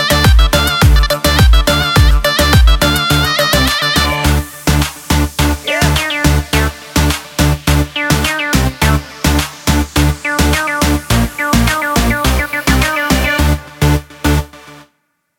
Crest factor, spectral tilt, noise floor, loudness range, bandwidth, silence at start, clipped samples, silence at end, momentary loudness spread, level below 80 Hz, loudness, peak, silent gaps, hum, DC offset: 12 dB; -4 dB/octave; -63 dBFS; 3 LU; 17.5 kHz; 0 s; under 0.1%; 0.6 s; 6 LU; -16 dBFS; -12 LUFS; 0 dBFS; none; none; under 0.1%